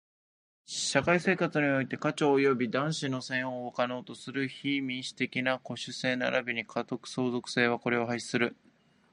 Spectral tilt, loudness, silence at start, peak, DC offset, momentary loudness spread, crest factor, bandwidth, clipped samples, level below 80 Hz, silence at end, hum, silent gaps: -4.5 dB/octave; -30 LUFS; 0.7 s; -8 dBFS; under 0.1%; 9 LU; 22 dB; 11 kHz; under 0.1%; -70 dBFS; 0.6 s; none; none